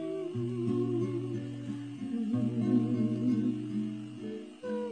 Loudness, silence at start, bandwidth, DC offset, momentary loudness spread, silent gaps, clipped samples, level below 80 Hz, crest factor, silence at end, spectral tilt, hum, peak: -33 LUFS; 0 s; 9.6 kHz; under 0.1%; 11 LU; none; under 0.1%; -74 dBFS; 16 dB; 0 s; -9 dB/octave; none; -16 dBFS